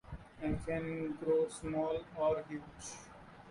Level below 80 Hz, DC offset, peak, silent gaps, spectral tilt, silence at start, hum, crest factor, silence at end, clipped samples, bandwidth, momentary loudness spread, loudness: -56 dBFS; under 0.1%; -22 dBFS; none; -6 dB/octave; 0.05 s; none; 16 dB; 0 s; under 0.1%; 11.5 kHz; 17 LU; -38 LUFS